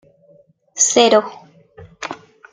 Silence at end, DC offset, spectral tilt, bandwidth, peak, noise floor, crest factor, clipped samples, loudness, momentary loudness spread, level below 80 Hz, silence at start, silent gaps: 0.35 s; under 0.1%; -1 dB/octave; 10 kHz; 0 dBFS; -53 dBFS; 20 dB; under 0.1%; -13 LUFS; 22 LU; -62 dBFS; 0.75 s; none